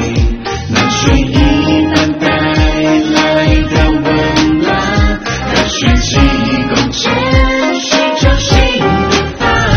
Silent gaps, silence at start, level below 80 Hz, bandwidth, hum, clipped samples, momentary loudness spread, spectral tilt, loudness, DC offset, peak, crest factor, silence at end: none; 0 s; -18 dBFS; 6.8 kHz; none; 0.2%; 3 LU; -5 dB/octave; -11 LUFS; under 0.1%; 0 dBFS; 10 dB; 0 s